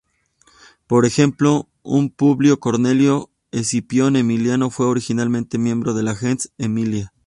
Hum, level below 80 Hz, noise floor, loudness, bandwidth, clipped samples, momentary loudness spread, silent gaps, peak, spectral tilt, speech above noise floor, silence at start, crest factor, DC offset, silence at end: none; -54 dBFS; -58 dBFS; -18 LUFS; 11.5 kHz; under 0.1%; 7 LU; none; -2 dBFS; -6 dB/octave; 41 dB; 0.9 s; 16 dB; under 0.1%; 0.2 s